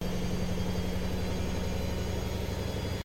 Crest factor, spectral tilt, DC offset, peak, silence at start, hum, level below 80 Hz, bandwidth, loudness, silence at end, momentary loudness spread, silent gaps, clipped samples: 12 dB; -6 dB/octave; under 0.1%; -20 dBFS; 0 s; none; -38 dBFS; 16.5 kHz; -34 LUFS; 0 s; 1 LU; none; under 0.1%